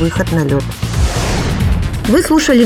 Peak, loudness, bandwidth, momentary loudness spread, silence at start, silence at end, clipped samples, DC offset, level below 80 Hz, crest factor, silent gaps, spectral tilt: 0 dBFS; -15 LUFS; 17 kHz; 6 LU; 0 s; 0 s; under 0.1%; under 0.1%; -20 dBFS; 12 dB; none; -5.5 dB/octave